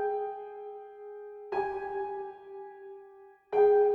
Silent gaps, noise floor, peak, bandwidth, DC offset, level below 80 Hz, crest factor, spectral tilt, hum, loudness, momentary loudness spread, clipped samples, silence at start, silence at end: none; -54 dBFS; -14 dBFS; 4.5 kHz; under 0.1%; -70 dBFS; 16 dB; -7 dB/octave; none; -31 LUFS; 22 LU; under 0.1%; 0 s; 0 s